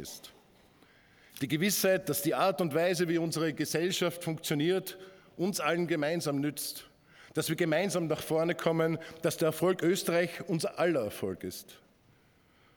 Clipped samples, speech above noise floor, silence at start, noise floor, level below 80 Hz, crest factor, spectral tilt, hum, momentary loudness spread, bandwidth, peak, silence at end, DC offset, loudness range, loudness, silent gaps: under 0.1%; 34 dB; 0 s; -65 dBFS; -72 dBFS; 18 dB; -4.5 dB/octave; none; 11 LU; 19.5 kHz; -14 dBFS; 1 s; under 0.1%; 3 LU; -31 LUFS; none